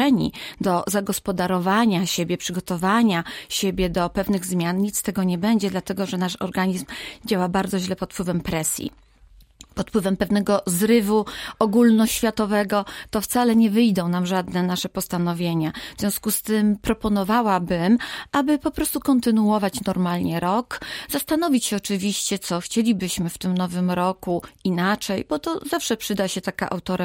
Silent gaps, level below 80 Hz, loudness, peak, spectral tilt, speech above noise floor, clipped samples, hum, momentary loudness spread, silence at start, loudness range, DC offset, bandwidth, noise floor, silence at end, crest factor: none; -48 dBFS; -22 LUFS; -6 dBFS; -5 dB/octave; 30 dB; under 0.1%; none; 8 LU; 0 s; 4 LU; under 0.1%; 16.5 kHz; -51 dBFS; 0 s; 16 dB